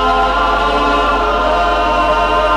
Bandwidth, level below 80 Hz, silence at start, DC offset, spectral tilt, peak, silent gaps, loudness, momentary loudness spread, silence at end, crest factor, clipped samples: 13 kHz; -24 dBFS; 0 s; under 0.1%; -4.5 dB/octave; -4 dBFS; none; -13 LUFS; 1 LU; 0 s; 10 dB; under 0.1%